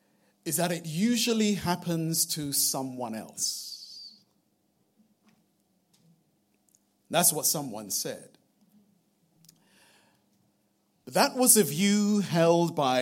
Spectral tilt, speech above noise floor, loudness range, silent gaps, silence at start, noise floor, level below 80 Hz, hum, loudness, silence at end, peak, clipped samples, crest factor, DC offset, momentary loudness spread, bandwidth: -3.5 dB/octave; 45 dB; 13 LU; none; 0.45 s; -72 dBFS; -72 dBFS; none; -26 LUFS; 0 s; -6 dBFS; under 0.1%; 24 dB; under 0.1%; 15 LU; 16.5 kHz